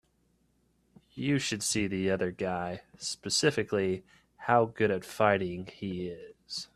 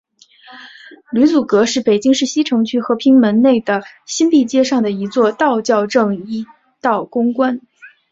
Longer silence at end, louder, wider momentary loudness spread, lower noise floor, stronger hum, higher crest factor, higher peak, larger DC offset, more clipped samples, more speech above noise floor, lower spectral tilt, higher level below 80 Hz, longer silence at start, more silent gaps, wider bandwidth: second, 0.1 s vs 0.25 s; second, -30 LUFS vs -15 LUFS; about the same, 12 LU vs 10 LU; first, -71 dBFS vs -44 dBFS; neither; first, 22 dB vs 14 dB; second, -8 dBFS vs -2 dBFS; neither; neither; first, 41 dB vs 30 dB; about the same, -4 dB/octave vs -4.5 dB/octave; about the same, -64 dBFS vs -60 dBFS; first, 1.15 s vs 0.5 s; neither; first, 13.5 kHz vs 7.8 kHz